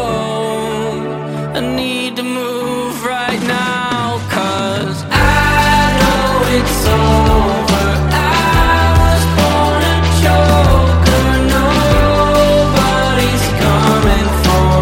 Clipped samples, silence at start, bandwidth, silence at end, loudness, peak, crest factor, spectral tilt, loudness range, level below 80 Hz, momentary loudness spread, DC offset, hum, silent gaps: under 0.1%; 0 s; 16.5 kHz; 0 s; -13 LUFS; 0 dBFS; 12 dB; -5 dB/octave; 6 LU; -20 dBFS; 8 LU; under 0.1%; none; none